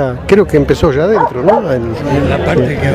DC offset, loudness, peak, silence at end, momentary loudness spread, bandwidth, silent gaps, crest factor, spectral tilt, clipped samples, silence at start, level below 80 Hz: under 0.1%; -11 LUFS; 0 dBFS; 0 s; 5 LU; 15.5 kHz; none; 10 dB; -7.5 dB/octave; 0.2%; 0 s; -28 dBFS